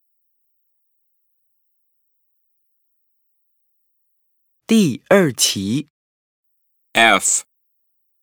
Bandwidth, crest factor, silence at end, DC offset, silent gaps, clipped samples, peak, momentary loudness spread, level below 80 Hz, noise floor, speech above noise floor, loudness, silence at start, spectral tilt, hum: over 20 kHz; 22 dB; 0.8 s; under 0.1%; 5.90-6.43 s; under 0.1%; 0 dBFS; 12 LU; -66 dBFS; -68 dBFS; 53 dB; -16 LUFS; 4.7 s; -3 dB/octave; none